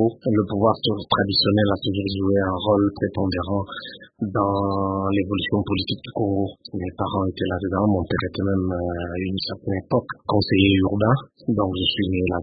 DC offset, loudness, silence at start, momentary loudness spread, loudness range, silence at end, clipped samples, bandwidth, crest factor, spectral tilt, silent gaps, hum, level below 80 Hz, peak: under 0.1%; -22 LUFS; 0 s; 9 LU; 3 LU; 0 s; under 0.1%; 5 kHz; 18 dB; -11.5 dB/octave; none; none; -48 dBFS; -2 dBFS